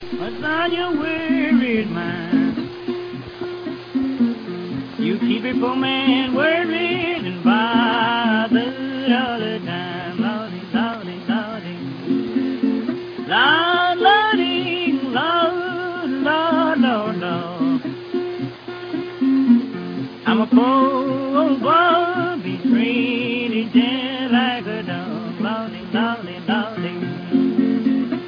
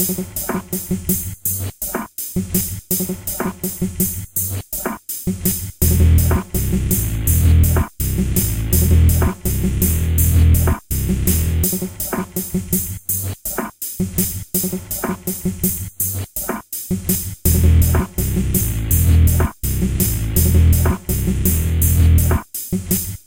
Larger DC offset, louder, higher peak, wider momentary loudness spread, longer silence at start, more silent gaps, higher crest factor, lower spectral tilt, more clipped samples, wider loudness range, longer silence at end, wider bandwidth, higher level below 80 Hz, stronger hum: neither; about the same, -20 LUFS vs -18 LUFS; about the same, -2 dBFS vs -2 dBFS; about the same, 12 LU vs 10 LU; about the same, 0 s vs 0 s; neither; about the same, 18 dB vs 16 dB; first, -7.5 dB/octave vs -5.5 dB/octave; neither; about the same, 6 LU vs 5 LU; about the same, 0 s vs 0.1 s; second, 5.2 kHz vs 17.5 kHz; second, -60 dBFS vs -22 dBFS; neither